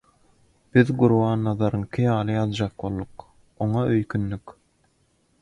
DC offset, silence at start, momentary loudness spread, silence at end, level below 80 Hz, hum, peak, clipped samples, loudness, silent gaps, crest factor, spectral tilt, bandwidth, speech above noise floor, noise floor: under 0.1%; 0.75 s; 12 LU; 0.9 s; -50 dBFS; none; -2 dBFS; under 0.1%; -23 LUFS; none; 22 dB; -8.5 dB/octave; 10 kHz; 43 dB; -65 dBFS